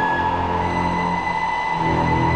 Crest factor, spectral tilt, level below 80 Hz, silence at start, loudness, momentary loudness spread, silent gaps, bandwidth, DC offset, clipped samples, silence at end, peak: 12 dB; -6.5 dB/octave; -38 dBFS; 0 s; -21 LUFS; 3 LU; none; 9.8 kHz; under 0.1%; under 0.1%; 0 s; -8 dBFS